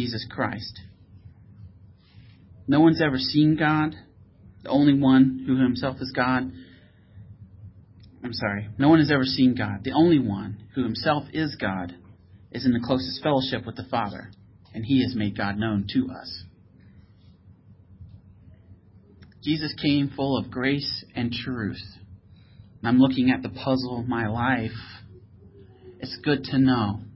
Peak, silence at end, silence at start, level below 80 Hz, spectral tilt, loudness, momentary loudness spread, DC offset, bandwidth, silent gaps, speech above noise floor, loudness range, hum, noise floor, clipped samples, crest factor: -6 dBFS; 0.05 s; 0 s; -52 dBFS; -10 dB/octave; -24 LUFS; 17 LU; under 0.1%; 5.8 kHz; none; 29 dB; 7 LU; none; -52 dBFS; under 0.1%; 18 dB